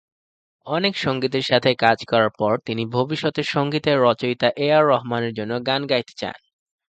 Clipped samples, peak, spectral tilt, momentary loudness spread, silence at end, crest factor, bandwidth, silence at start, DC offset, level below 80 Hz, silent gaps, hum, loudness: under 0.1%; 0 dBFS; -6 dB/octave; 8 LU; 0.55 s; 20 dB; 8.8 kHz; 0.65 s; under 0.1%; -60 dBFS; none; none; -20 LUFS